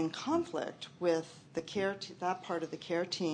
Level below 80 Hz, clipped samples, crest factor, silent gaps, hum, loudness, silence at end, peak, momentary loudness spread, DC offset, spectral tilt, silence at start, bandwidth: -76 dBFS; under 0.1%; 18 dB; none; none; -36 LUFS; 0 s; -18 dBFS; 7 LU; under 0.1%; -5 dB/octave; 0 s; 9.8 kHz